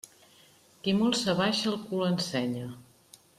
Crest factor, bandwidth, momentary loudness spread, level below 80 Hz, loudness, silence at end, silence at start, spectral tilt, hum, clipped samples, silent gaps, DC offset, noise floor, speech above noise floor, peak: 18 dB; 14.5 kHz; 15 LU; -68 dBFS; -29 LUFS; 0.55 s; 0.85 s; -4.5 dB/octave; none; under 0.1%; none; under 0.1%; -59 dBFS; 31 dB; -14 dBFS